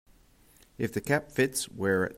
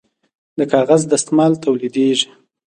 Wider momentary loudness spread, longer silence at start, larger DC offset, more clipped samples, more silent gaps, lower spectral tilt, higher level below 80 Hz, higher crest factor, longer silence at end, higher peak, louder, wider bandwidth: second, 6 LU vs 9 LU; first, 0.8 s vs 0.55 s; neither; neither; neither; about the same, -4.5 dB/octave vs -4.5 dB/octave; about the same, -60 dBFS vs -60 dBFS; about the same, 20 dB vs 16 dB; second, 0 s vs 0.45 s; second, -12 dBFS vs 0 dBFS; second, -29 LUFS vs -16 LUFS; first, 16 kHz vs 11 kHz